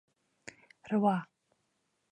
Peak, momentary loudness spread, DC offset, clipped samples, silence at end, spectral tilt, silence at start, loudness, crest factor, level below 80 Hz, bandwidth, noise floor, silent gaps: -14 dBFS; 23 LU; under 0.1%; under 0.1%; 0.85 s; -7.5 dB/octave; 0.85 s; -32 LUFS; 22 dB; -82 dBFS; 9 kHz; -79 dBFS; none